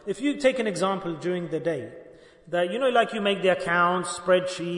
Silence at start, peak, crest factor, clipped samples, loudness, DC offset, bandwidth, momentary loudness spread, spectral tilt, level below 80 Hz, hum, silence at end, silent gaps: 0.05 s; -8 dBFS; 16 dB; under 0.1%; -25 LUFS; under 0.1%; 11 kHz; 7 LU; -4.5 dB/octave; -64 dBFS; none; 0 s; none